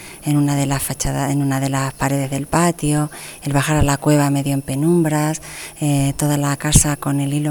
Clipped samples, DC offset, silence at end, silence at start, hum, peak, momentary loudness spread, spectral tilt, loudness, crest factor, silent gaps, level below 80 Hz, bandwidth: under 0.1%; under 0.1%; 0 s; 0 s; none; 0 dBFS; 6 LU; -5 dB/octave; -18 LUFS; 18 dB; none; -34 dBFS; over 20 kHz